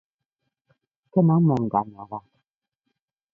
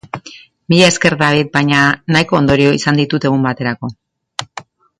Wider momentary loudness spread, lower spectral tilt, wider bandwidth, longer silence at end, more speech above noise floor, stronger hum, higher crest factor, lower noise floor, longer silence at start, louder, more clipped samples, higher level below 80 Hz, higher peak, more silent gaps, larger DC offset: about the same, 19 LU vs 17 LU; first, -12 dB/octave vs -5 dB/octave; second, 3.7 kHz vs 11.5 kHz; first, 1.15 s vs 0.4 s; first, 60 dB vs 26 dB; neither; first, 20 dB vs 14 dB; first, -81 dBFS vs -39 dBFS; first, 1.15 s vs 0.15 s; second, -22 LUFS vs -12 LUFS; neither; second, -62 dBFS vs -44 dBFS; second, -6 dBFS vs 0 dBFS; neither; neither